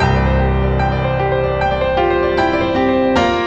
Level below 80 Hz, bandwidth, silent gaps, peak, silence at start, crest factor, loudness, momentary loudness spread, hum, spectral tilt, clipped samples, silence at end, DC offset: -24 dBFS; 8 kHz; none; -2 dBFS; 0 s; 12 dB; -15 LUFS; 2 LU; none; -7 dB/octave; under 0.1%; 0 s; under 0.1%